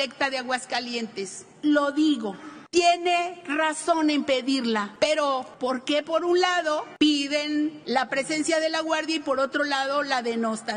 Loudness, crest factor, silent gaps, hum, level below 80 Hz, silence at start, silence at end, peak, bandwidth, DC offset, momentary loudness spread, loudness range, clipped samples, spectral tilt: -25 LUFS; 18 dB; none; none; -68 dBFS; 0 s; 0 s; -6 dBFS; 10 kHz; under 0.1%; 7 LU; 1 LU; under 0.1%; -2.5 dB/octave